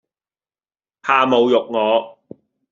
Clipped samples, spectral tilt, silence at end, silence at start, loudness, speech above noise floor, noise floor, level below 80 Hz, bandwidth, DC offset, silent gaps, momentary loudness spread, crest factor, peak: under 0.1%; -2 dB/octave; 0.6 s; 1.05 s; -16 LUFS; over 74 dB; under -90 dBFS; -68 dBFS; 7.4 kHz; under 0.1%; none; 12 LU; 18 dB; -2 dBFS